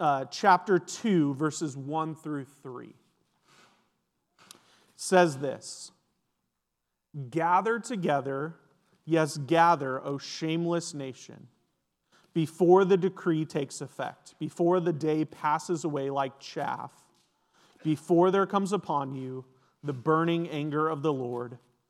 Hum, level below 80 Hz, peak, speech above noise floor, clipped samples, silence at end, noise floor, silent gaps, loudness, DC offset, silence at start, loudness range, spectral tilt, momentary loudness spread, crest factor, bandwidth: none; -84 dBFS; -8 dBFS; 55 dB; under 0.1%; 0.35 s; -83 dBFS; none; -28 LUFS; under 0.1%; 0 s; 4 LU; -6 dB/octave; 16 LU; 22 dB; 13 kHz